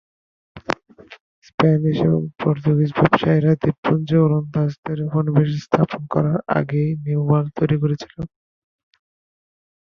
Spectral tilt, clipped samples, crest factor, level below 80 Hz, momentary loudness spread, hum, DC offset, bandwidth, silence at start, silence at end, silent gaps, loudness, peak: -9 dB/octave; under 0.1%; 20 dB; -52 dBFS; 11 LU; none; under 0.1%; 6.6 kHz; 0.55 s; 1.65 s; 1.21-1.42 s, 1.54-1.58 s, 3.78-3.83 s, 4.78-4.83 s; -19 LUFS; 0 dBFS